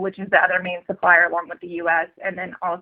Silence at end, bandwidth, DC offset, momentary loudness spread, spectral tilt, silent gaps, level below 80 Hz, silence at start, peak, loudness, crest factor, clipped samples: 0 s; 4.6 kHz; under 0.1%; 13 LU; -8 dB/octave; none; -66 dBFS; 0 s; -2 dBFS; -20 LUFS; 20 dB; under 0.1%